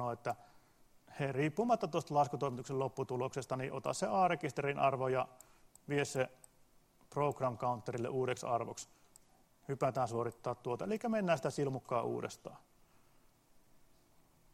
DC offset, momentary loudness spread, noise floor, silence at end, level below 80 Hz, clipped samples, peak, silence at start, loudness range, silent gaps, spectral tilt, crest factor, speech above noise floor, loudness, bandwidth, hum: under 0.1%; 11 LU; -67 dBFS; 1.95 s; -72 dBFS; under 0.1%; -18 dBFS; 0 s; 4 LU; none; -6 dB/octave; 20 dB; 31 dB; -37 LUFS; 16 kHz; none